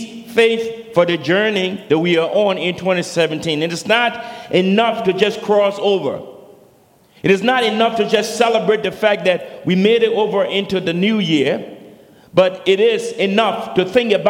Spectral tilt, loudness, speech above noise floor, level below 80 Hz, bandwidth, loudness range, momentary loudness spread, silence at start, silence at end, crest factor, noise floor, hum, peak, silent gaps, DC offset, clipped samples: -5 dB/octave; -16 LUFS; 35 dB; -60 dBFS; 16.5 kHz; 2 LU; 5 LU; 0 s; 0 s; 16 dB; -51 dBFS; none; 0 dBFS; none; under 0.1%; under 0.1%